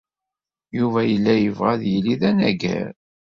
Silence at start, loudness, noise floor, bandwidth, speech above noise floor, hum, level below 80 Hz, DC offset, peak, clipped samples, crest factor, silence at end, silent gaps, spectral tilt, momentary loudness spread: 0.75 s; -20 LUFS; -87 dBFS; 7 kHz; 68 dB; none; -54 dBFS; under 0.1%; -4 dBFS; under 0.1%; 16 dB; 0.35 s; none; -7.5 dB/octave; 9 LU